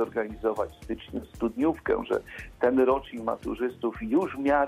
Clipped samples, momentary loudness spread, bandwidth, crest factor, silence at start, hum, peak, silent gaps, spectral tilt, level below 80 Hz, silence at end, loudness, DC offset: under 0.1%; 11 LU; 14.5 kHz; 16 dB; 0 s; none; -10 dBFS; none; -7 dB/octave; -50 dBFS; 0 s; -28 LUFS; under 0.1%